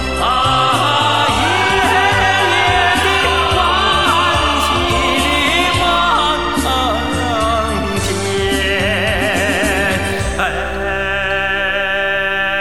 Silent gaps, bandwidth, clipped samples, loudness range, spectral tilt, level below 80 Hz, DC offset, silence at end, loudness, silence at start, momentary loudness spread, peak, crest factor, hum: none; 17.5 kHz; under 0.1%; 3 LU; -3.5 dB/octave; -28 dBFS; 2%; 0 s; -14 LUFS; 0 s; 5 LU; 0 dBFS; 14 dB; none